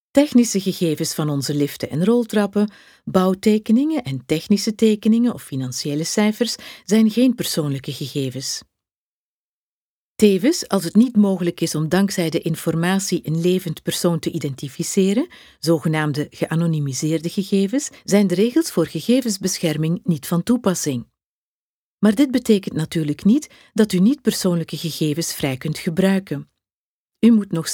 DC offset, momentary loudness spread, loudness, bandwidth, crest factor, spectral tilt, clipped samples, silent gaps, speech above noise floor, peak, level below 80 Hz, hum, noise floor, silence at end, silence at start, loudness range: under 0.1%; 9 LU; -20 LUFS; 20 kHz; 20 dB; -5.5 dB/octave; under 0.1%; 8.96-10.15 s, 21.26-21.98 s, 26.75-27.08 s; over 71 dB; 0 dBFS; -58 dBFS; none; under -90 dBFS; 0 s; 0.15 s; 3 LU